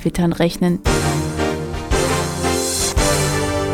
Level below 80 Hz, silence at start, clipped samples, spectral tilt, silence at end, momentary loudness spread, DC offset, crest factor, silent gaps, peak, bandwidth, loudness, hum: -28 dBFS; 0 s; under 0.1%; -4.5 dB/octave; 0 s; 5 LU; under 0.1%; 16 dB; none; -2 dBFS; 17.5 kHz; -18 LUFS; none